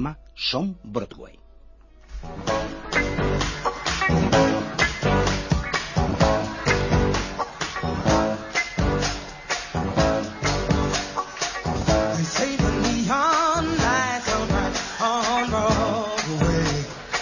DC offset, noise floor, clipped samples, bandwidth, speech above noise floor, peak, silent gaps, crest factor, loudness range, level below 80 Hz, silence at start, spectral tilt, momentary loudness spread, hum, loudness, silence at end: under 0.1%; -48 dBFS; under 0.1%; 7.4 kHz; 19 dB; -6 dBFS; none; 18 dB; 3 LU; -34 dBFS; 0 s; -4.5 dB/octave; 8 LU; none; -23 LUFS; 0 s